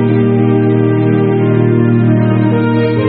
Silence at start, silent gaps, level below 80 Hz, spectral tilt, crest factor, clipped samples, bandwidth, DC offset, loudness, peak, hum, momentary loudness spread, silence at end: 0 s; none; -48 dBFS; -8.5 dB/octave; 10 dB; under 0.1%; 4.5 kHz; 0.2%; -11 LUFS; 0 dBFS; none; 1 LU; 0 s